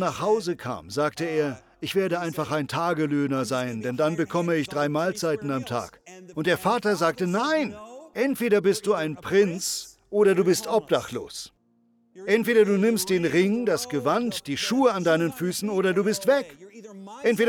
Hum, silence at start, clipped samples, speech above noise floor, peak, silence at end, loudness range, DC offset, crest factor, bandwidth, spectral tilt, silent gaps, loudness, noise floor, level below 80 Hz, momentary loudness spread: none; 0 s; under 0.1%; 41 dB; -8 dBFS; 0 s; 3 LU; under 0.1%; 16 dB; 19 kHz; -5 dB/octave; none; -24 LUFS; -65 dBFS; -64 dBFS; 11 LU